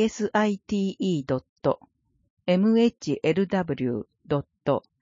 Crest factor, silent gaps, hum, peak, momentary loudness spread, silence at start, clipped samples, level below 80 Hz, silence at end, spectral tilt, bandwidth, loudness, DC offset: 16 dB; 1.49-1.56 s, 2.30-2.37 s; none; -8 dBFS; 8 LU; 0 s; under 0.1%; -60 dBFS; 0.25 s; -6.5 dB/octave; 7.6 kHz; -26 LUFS; under 0.1%